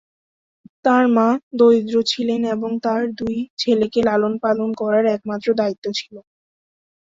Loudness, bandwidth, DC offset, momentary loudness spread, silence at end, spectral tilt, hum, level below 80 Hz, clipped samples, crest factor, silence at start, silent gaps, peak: -19 LUFS; 7.8 kHz; under 0.1%; 9 LU; 0.8 s; -5 dB/octave; none; -58 dBFS; under 0.1%; 16 dB; 0.85 s; 1.43-1.51 s, 3.50-3.57 s, 5.78-5.82 s; -4 dBFS